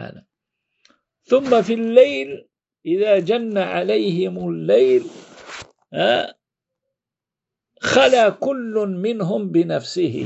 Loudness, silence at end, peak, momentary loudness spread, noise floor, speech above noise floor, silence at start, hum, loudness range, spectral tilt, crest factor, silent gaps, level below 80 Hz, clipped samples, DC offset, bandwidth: -18 LUFS; 0 s; 0 dBFS; 19 LU; -87 dBFS; 69 dB; 0 s; none; 3 LU; -5.5 dB/octave; 20 dB; none; -62 dBFS; under 0.1%; under 0.1%; 8.2 kHz